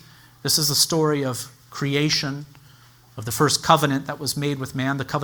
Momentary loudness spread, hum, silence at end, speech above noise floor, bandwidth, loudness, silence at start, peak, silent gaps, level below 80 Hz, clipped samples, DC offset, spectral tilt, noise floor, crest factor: 14 LU; none; 0 s; 29 dB; over 20 kHz; -21 LUFS; 0.45 s; -2 dBFS; none; -56 dBFS; under 0.1%; under 0.1%; -3.5 dB/octave; -51 dBFS; 22 dB